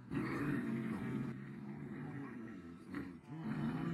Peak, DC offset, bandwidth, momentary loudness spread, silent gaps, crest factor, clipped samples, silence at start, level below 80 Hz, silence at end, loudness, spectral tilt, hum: -26 dBFS; under 0.1%; 13 kHz; 10 LU; none; 16 dB; under 0.1%; 0 s; -68 dBFS; 0 s; -44 LUFS; -8 dB/octave; none